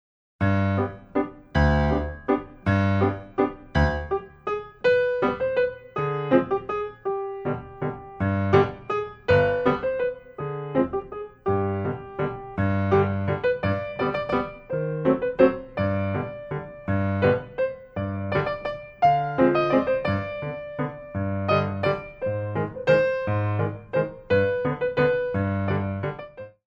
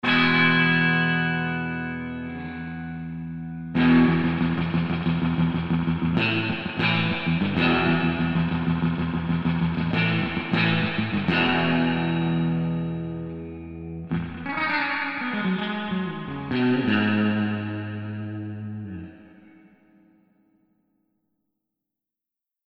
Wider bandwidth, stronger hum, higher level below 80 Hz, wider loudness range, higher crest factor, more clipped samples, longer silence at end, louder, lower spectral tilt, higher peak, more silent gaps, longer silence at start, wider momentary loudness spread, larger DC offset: first, 6.8 kHz vs 5.6 kHz; neither; first, -40 dBFS vs -48 dBFS; second, 2 LU vs 5 LU; about the same, 20 dB vs 18 dB; neither; second, 0.2 s vs 3.4 s; about the same, -25 LUFS vs -24 LUFS; about the same, -8.5 dB/octave vs -8.5 dB/octave; about the same, -4 dBFS vs -6 dBFS; neither; first, 0.4 s vs 0.05 s; second, 10 LU vs 14 LU; neither